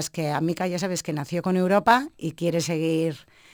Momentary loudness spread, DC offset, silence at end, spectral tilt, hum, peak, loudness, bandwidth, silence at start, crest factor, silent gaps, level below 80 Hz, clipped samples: 9 LU; under 0.1%; 0.3 s; -5 dB/octave; none; -4 dBFS; -24 LUFS; over 20 kHz; 0 s; 20 dB; none; -62 dBFS; under 0.1%